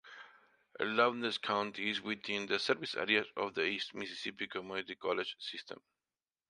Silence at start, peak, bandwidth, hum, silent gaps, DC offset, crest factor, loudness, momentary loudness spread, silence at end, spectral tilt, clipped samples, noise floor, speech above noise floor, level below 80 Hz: 0.05 s; -14 dBFS; 11 kHz; none; none; under 0.1%; 24 dB; -36 LUFS; 12 LU; 0.75 s; -3.5 dB/octave; under 0.1%; under -90 dBFS; over 53 dB; -78 dBFS